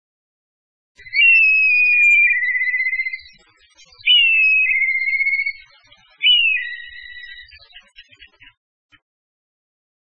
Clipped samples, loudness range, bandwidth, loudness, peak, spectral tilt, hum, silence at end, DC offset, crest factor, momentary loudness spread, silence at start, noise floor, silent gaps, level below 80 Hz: under 0.1%; 7 LU; 7.6 kHz; -13 LUFS; -4 dBFS; 3 dB/octave; none; 2.15 s; 0.5%; 16 dB; 20 LU; 1.05 s; -52 dBFS; none; -58 dBFS